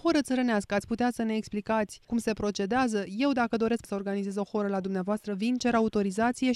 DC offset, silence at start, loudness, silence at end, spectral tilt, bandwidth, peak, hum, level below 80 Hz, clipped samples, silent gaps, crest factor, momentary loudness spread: under 0.1%; 0.05 s; -29 LUFS; 0 s; -5.5 dB/octave; 13 kHz; -12 dBFS; none; -58 dBFS; under 0.1%; none; 16 dB; 5 LU